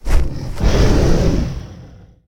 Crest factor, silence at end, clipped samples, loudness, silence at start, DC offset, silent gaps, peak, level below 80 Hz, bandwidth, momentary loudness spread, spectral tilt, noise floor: 14 dB; 0.4 s; under 0.1%; -18 LUFS; 0.05 s; under 0.1%; none; 0 dBFS; -18 dBFS; 13 kHz; 13 LU; -6.5 dB/octave; -40 dBFS